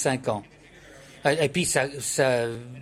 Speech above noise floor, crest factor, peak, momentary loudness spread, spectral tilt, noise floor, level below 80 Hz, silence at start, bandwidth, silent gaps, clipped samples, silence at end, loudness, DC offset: 24 dB; 18 dB; -8 dBFS; 8 LU; -3.5 dB/octave; -49 dBFS; -58 dBFS; 0 s; 16 kHz; none; under 0.1%; 0 s; -25 LUFS; under 0.1%